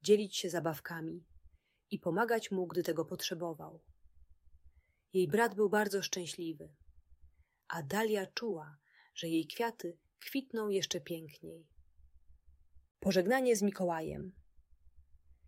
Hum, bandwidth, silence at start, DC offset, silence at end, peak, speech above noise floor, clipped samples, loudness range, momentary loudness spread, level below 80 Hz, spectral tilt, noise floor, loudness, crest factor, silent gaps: none; 16 kHz; 0.05 s; under 0.1%; 0.45 s; -16 dBFS; 30 dB; under 0.1%; 4 LU; 20 LU; -68 dBFS; -4.5 dB/octave; -65 dBFS; -35 LUFS; 22 dB; 12.91-12.95 s